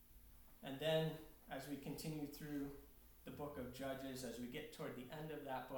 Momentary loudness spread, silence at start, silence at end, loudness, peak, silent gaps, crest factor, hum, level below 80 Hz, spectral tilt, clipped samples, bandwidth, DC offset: 18 LU; 0 s; 0 s; -48 LUFS; -28 dBFS; none; 20 dB; none; -66 dBFS; -5.5 dB/octave; under 0.1%; 19 kHz; under 0.1%